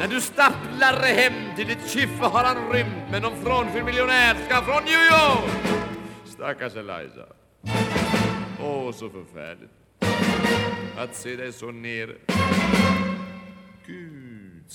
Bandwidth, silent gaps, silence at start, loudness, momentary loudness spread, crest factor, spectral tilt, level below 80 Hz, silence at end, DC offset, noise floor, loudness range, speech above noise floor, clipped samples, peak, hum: 17.5 kHz; none; 0 s; -21 LUFS; 21 LU; 20 dB; -4.5 dB/octave; -48 dBFS; 0 s; under 0.1%; -44 dBFS; 8 LU; 21 dB; under 0.1%; -4 dBFS; none